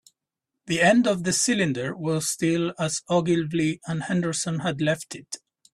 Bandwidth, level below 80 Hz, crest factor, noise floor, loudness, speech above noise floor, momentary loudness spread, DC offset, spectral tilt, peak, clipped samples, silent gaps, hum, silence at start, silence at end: 13.5 kHz; -62 dBFS; 18 dB; -85 dBFS; -24 LUFS; 61 dB; 10 LU; under 0.1%; -4.5 dB/octave; -6 dBFS; under 0.1%; none; none; 0.65 s; 0.35 s